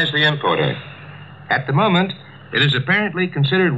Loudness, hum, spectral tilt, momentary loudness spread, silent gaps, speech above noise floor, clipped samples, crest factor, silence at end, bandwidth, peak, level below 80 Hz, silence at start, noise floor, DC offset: -18 LUFS; none; -7 dB/octave; 19 LU; none; 20 dB; under 0.1%; 16 dB; 0 s; 7.8 kHz; -2 dBFS; -58 dBFS; 0 s; -37 dBFS; 0.2%